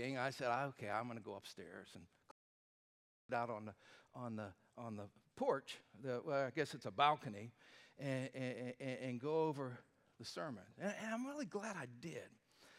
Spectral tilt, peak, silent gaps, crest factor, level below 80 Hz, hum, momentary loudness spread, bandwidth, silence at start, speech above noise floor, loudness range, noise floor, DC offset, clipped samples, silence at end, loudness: -5.5 dB/octave; -20 dBFS; 2.31-3.29 s; 24 dB; -88 dBFS; none; 16 LU; 15.5 kHz; 0 s; over 46 dB; 8 LU; under -90 dBFS; under 0.1%; under 0.1%; 0 s; -44 LUFS